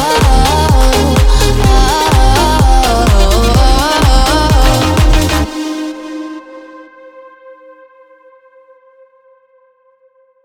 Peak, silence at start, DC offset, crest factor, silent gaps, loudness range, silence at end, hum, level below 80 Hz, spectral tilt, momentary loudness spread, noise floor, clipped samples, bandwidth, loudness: 0 dBFS; 0 s; under 0.1%; 10 dB; none; 16 LU; 2.95 s; none; -14 dBFS; -5 dB/octave; 14 LU; -51 dBFS; under 0.1%; 17 kHz; -10 LUFS